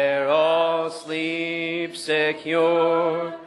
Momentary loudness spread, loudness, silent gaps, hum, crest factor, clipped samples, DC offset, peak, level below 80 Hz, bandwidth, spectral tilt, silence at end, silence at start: 8 LU; -22 LUFS; none; none; 14 dB; under 0.1%; under 0.1%; -8 dBFS; -80 dBFS; 11.5 kHz; -4.5 dB/octave; 0 s; 0 s